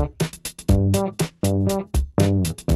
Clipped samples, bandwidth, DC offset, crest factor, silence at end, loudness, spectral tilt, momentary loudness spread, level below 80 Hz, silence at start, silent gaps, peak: under 0.1%; 14.5 kHz; under 0.1%; 16 dB; 0 s; -22 LUFS; -6 dB/octave; 7 LU; -30 dBFS; 0 s; none; -4 dBFS